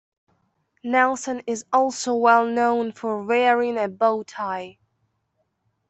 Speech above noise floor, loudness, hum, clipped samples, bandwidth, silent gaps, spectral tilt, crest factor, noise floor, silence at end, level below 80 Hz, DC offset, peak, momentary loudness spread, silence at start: 51 dB; -21 LUFS; none; under 0.1%; 8.4 kHz; none; -3.5 dB/octave; 20 dB; -73 dBFS; 1.2 s; -72 dBFS; under 0.1%; -4 dBFS; 12 LU; 0.85 s